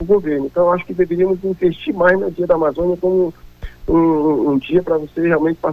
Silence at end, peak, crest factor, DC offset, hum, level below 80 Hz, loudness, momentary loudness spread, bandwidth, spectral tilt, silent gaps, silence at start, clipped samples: 0 s; -2 dBFS; 14 dB; under 0.1%; none; -38 dBFS; -17 LUFS; 4 LU; 5.6 kHz; -9 dB/octave; none; 0 s; under 0.1%